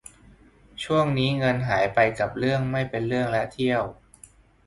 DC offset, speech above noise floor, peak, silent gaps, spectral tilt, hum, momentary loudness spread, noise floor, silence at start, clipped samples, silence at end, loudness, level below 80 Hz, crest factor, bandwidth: under 0.1%; 30 dB; -6 dBFS; none; -6.5 dB/octave; none; 6 LU; -53 dBFS; 0.8 s; under 0.1%; 0.75 s; -24 LUFS; -52 dBFS; 20 dB; 11.5 kHz